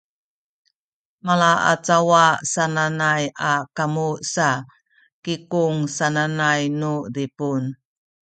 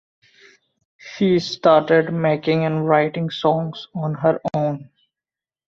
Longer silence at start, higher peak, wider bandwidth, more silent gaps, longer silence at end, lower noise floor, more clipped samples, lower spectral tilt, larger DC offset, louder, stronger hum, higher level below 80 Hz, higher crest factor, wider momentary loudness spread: first, 1.25 s vs 1.05 s; about the same, -2 dBFS vs -2 dBFS; first, 9.2 kHz vs 7.4 kHz; first, 5.12-5.23 s vs none; second, 0.6 s vs 0.85 s; about the same, under -90 dBFS vs under -90 dBFS; neither; second, -4.5 dB/octave vs -7 dB/octave; neither; about the same, -20 LUFS vs -19 LUFS; neither; about the same, -64 dBFS vs -60 dBFS; about the same, 20 dB vs 18 dB; about the same, 11 LU vs 11 LU